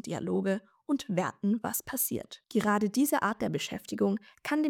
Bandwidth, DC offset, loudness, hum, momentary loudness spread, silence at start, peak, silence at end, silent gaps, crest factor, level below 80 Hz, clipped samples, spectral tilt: 19 kHz; under 0.1%; -31 LUFS; none; 7 LU; 0.05 s; -16 dBFS; 0 s; none; 16 dB; -68 dBFS; under 0.1%; -5 dB/octave